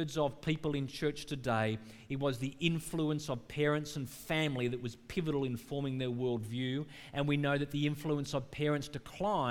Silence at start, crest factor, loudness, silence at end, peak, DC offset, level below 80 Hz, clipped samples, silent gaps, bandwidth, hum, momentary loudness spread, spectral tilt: 0 s; 18 dB; -36 LUFS; 0 s; -16 dBFS; under 0.1%; -58 dBFS; under 0.1%; none; 17.5 kHz; none; 7 LU; -6 dB/octave